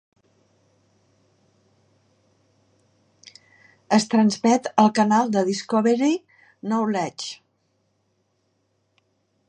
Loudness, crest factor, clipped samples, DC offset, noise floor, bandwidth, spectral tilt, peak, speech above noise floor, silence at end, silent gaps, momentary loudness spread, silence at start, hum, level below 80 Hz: -21 LUFS; 24 dB; under 0.1%; under 0.1%; -70 dBFS; 9.8 kHz; -5 dB/octave; -2 dBFS; 50 dB; 2.15 s; none; 13 LU; 3.9 s; none; -74 dBFS